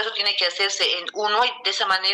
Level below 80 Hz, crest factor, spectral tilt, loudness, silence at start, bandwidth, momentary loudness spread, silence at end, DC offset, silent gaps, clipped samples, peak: -70 dBFS; 14 dB; 1 dB/octave; -21 LUFS; 0 s; 14 kHz; 3 LU; 0 s; under 0.1%; none; under 0.1%; -8 dBFS